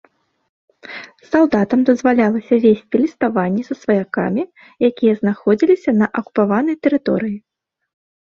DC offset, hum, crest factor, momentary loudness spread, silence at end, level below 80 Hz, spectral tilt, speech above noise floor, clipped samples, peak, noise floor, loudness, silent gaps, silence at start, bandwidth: under 0.1%; none; 16 dB; 10 LU; 0.9 s; -58 dBFS; -8 dB/octave; 20 dB; under 0.1%; -2 dBFS; -36 dBFS; -17 LUFS; none; 0.85 s; 7 kHz